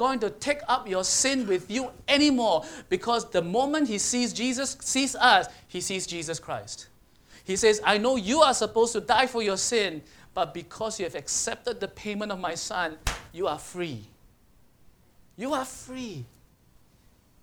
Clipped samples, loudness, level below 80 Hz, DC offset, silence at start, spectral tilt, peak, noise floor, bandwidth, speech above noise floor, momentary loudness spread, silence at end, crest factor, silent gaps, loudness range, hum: under 0.1%; -26 LUFS; -52 dBFS; under 0.1%; 0 s; -2.5 dB/octave; -4 dBFS; -60 dBFS; 19.5 kHz; 34 dB; 14 LU; 1.2 s; 24 dB; none; 11 LU; none